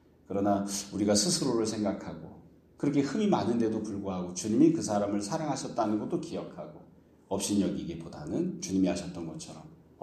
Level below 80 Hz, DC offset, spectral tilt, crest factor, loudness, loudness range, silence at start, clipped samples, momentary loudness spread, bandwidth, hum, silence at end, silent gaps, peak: -62 dBFS; under 0.1%; -5 dB/octave; 20 dB; -30 LUFS; 4 LU; 0.3 s; under 0.1%; 15 LU; 14 kHz; none; 0.3 s; none; -12 dBFS